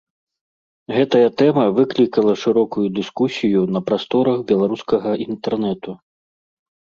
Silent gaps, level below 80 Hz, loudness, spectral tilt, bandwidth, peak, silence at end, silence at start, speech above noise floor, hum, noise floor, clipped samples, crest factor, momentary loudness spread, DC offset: none; -60 dBFS; -18 LUFS; -7 dB/octave; 7.2 kHz; -2 dBFS; 0.95 s; 0.9 s; over 73 dB; none; under -90 dBFS; under 0.1%; 16 dB; 8 LU; under 0.1%